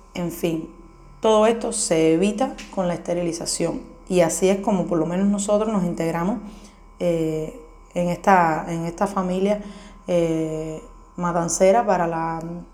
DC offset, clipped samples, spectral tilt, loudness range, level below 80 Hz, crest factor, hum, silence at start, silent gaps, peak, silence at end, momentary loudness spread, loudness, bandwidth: under 0.1%; under 0.1%; -5 dB/octave; 2 LU; -46 dBFS; 20 dB; none; 0.15 s; none; 0 dBFS; 0.05 s; 13 LU; -22 LUFS; 17.5 kHz